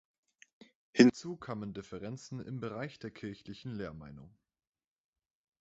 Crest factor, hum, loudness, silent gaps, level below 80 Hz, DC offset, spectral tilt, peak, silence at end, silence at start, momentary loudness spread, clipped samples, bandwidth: 28 dB; none; -34 LUFS; none; -68 dBFS; under 0.1%; -5.5 dB/octave; -8 dBFS; 1.3 s; 0.95 s; 20 LU; under 0.1%; 8 kHz